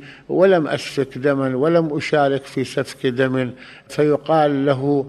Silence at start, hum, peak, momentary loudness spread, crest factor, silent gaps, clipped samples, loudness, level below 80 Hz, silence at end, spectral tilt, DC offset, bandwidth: 0 s; none; -2 dBFS; 9 LU; 16 dB; none; under 0.1%; -19 LUFS; -58 dBFS; 0 s; -6.5 dB/octave; under 0.1%; 13 kHz